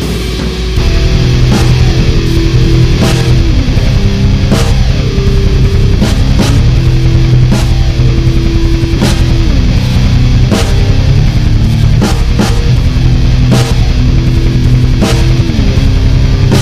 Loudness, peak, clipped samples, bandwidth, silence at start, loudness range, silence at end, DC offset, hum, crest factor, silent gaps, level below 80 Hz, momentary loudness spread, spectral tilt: -9 LUFS; 0 dBFS; 1%; 14 kHz; 0 s; 1 LU; 0 s; under 0.1%; none; 6 dB; none; -10 dBFS; 2 LU; -6.5 dB/octave